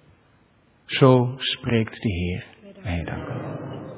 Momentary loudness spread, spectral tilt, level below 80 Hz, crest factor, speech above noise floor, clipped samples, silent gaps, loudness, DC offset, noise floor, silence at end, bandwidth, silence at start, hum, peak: 17 LU; -11 dB/octave; -42 dBFS; 22 dB; 37 dB; under 0.1%; none; -23 LUFS; under 0.1%; -59 dBFS; 0 s; 4 kHz; 0.9 s; none; -2 dBFS